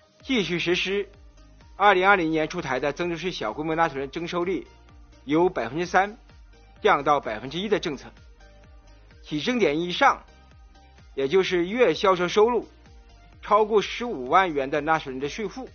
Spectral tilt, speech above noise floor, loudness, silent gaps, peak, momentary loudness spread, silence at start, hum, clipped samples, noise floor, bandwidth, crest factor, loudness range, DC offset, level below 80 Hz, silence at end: -3 dB/octave; 27 dB; -24 LUFS; none; -4 dBFS; 11 LU; 0.25 s; none; under 0.1%; -50 dBFS; 6.8 kHz; 22 dB; 4 LU; under 0.1%; -50 dBFS; 0.05 s